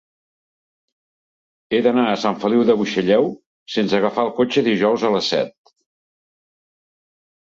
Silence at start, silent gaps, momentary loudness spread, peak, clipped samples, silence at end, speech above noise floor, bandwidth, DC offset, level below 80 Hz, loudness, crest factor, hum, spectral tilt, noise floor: 1.7 s; 3.46-3.66 s; 6 LU; -4 dBFS; under 0.1%; 2 s; over 72 dB; 7.8 kHz; under 0.1%; -64 dBFS; -18 LUFS; 18 dB; none; -5.5 dB/octave; under -90 dBFS